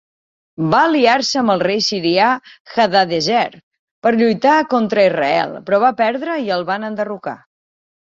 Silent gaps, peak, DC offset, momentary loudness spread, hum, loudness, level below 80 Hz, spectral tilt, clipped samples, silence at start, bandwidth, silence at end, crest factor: 2.60-2.65 s, 3.63-3.71 s, 3.79-4.02 s; -2 dBFS; under 0.1%; 10 LU; none; -16 LUFS; -60 dBFS; -4.5 dB/octave; under 0.1%; 0.6 s; 7.8 kHz; 0.85 s; 16 dB